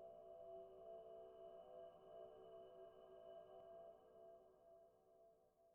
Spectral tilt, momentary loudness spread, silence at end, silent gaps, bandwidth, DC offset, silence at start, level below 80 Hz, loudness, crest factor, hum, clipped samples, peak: -3.5 dB/octave; 6 LU; 0 s; none; 3.1 kHz; under 0.1%; 0 s; -88 dBFS; -62 LUFS; 14 dB; none; under 0.1%; -48 dBFS